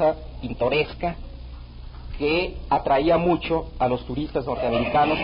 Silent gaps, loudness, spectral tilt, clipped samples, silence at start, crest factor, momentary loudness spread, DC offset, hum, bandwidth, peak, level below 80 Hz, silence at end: none; -23 LUFS; -10.5 dB/octave; under 0.1%; 0 s; 14 dB; 20 LU; under 0.1%; none; 5.4 kHz; -8 dBFS; -38 dBFS; 0 s